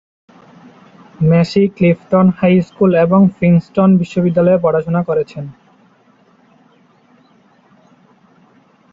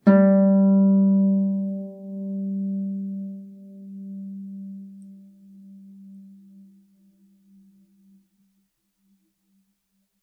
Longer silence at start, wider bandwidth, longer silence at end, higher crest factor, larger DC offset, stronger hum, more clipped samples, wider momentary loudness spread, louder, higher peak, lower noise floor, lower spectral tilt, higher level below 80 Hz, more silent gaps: first, 1.2 s vs 0.05 s; first, 7.4 kHz vs 2.3 kHz; second, 3.4 s vs 4 s; second, 14 dB vs 20 dB; neither; neither; neither; second, 7 LU vs 26 LU; first, -13 LUFS vs -21 LUFS; first, -2 dBFS vs -6 dBFS; second, -51 dBFS vs -73 dBFS; second, -9.5 dB/octave vs -12 dB/octave; first, -52 dBFS vs -80 dBFS; neither